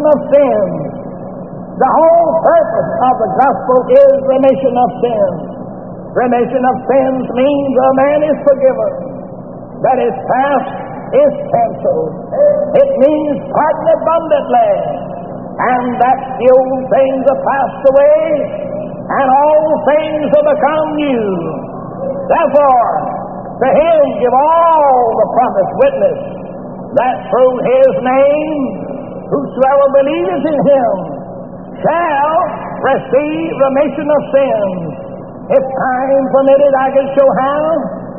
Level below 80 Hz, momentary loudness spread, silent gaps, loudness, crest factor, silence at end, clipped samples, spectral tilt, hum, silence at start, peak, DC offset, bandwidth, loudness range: -46 dBFS; 14 LU; none; -12 LUFS; 12 dB; 0 s; under 0.1%; -2.5 dB/octave; none; 0 s; 0 dBFS; 0.7%; 3.8 kHz; 3 LU